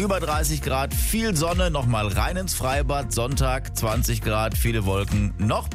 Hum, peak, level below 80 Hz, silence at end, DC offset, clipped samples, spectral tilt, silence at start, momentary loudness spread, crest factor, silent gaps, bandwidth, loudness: none; -10 dBFS; -28 dBFS; 0 s; under 0.1%; under 0.1%; -4.5 dB/octave; 0 s; 2 LU; 12 dB; none; 16 kHz; -24 LUFS